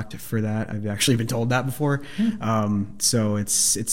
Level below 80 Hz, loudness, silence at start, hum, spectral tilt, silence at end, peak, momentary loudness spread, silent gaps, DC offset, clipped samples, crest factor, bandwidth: -52 dBFS; -23 LUFS; 0 s; none; -4 dB/octave; 0 s; -8 dBFS; 8 LU; none; 1%; under 0.1%; 16 dB; 16.5 kHz